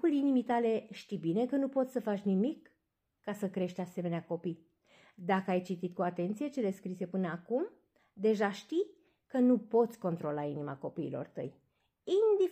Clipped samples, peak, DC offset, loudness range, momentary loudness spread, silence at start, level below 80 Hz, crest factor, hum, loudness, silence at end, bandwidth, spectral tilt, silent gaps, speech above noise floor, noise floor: under 0.1%; -18 dBFS; under 0.1%; 4 LU; 13 LU; 0.05 s; -82 dBFS; 16 dB; none; -34 LUFS; 0 s; 15 kHz; -7.5 dB/octave; none; 50 dB; -83 dBFS